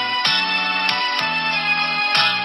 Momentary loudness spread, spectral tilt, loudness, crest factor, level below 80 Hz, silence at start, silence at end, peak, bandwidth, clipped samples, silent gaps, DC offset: 3 LU; -2 dB/octave; -17 LUFS; 16 dB; -60 dBFS; 0 s; 0 s; -4 dBFS; 16 kHz; under 0.1%; none; under 0.1%